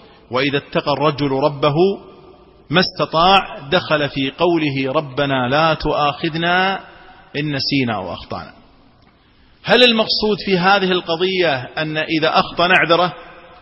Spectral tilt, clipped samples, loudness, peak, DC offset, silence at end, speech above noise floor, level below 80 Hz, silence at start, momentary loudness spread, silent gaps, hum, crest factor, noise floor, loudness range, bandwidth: -6.5 dB/octave; under 0.1%; -16 LUFS; 0 dBFS; under 0.1%; 0.2 s; 34 dB; -44 dBFS; 0.3 s; 11 LU; none; none; 18 dB; -51 dBFS; 4 LU; 9.2 kHz